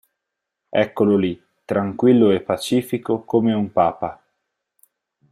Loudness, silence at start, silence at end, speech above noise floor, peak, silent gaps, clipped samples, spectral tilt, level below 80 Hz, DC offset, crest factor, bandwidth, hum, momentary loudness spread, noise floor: -20 LUFS; 0.75 s; 1.15 s; 63 dB; -4 dBFS; none; under 0.1%; -7 dB/octave; -60 dBFS; under 0.1%; 16 dB; 14.5 kHz; none; 10 LU; -81 dBFS